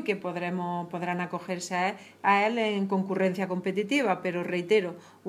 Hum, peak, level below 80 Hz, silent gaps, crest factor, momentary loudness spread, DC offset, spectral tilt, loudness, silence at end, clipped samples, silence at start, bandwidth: none; -10 dBFS; -84 dBFS; none; 20 dB; 8 LU; under 0.1%; -5.5 dB/octave; -28 LUFS; 0 s; under 0.1%; 0 s; 14 kHz